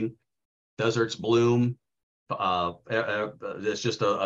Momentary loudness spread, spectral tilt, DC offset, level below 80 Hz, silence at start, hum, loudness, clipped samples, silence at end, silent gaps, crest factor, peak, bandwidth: 11 LU; -5.5 dB/octave; under 0.1%; -66 dBFS; 0 s; none; -27 LUFS; under 0.1%; 0 s; 0.45-0.77 s, 2.03-2.26 s; 16 dB; -10 dBFS; 7.8 kHz